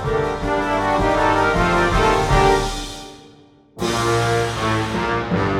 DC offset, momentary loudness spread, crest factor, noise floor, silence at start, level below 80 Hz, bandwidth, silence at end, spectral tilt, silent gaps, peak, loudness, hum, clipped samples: under 0.1%; 10 LU; 16 dB; -48 dBFS; 0 s; -30 dBFS; 16 kHz; 0 s; -5 dB/octave; none; -4 dBFS; -18 LUFS; none; under 0.1%